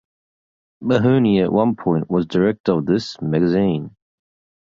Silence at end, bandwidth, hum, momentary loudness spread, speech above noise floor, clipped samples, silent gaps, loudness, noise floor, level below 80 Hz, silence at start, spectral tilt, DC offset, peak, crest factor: 0.75 s; 7.6 kHz; none; 7 LU; over 73 dB; under 0.1%; 2.60-2.64 s; -18 LUFS; under -90 dBFS; -52 dBFS; 0.8 s; -8 dB/octave; under 0.1%; -2 dBFS; 16 dB